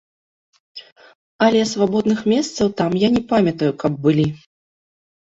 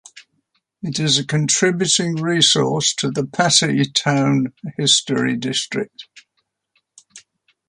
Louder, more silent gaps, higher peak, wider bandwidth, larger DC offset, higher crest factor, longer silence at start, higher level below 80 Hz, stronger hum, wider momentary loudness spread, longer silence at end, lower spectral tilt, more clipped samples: about the same, -18 LUFS vs -17 LUFS; first, 0.92-0.96 s, 1.15-1.39 s vs none; about the same, -2 dBFS vs 0 dBFS; second, 8 kHz vs 11.5 kHz; neither; about the same, 18 dB vs 20 dB; first, 0.75 s vs 0.15 s; first, -54 dBFS vs -62 dBFS; neither; first, 22 LU vs 10 LU; first, 1.05 s vs 0.5 s; first, -6 dB/octave vs -3 dB/octave; neither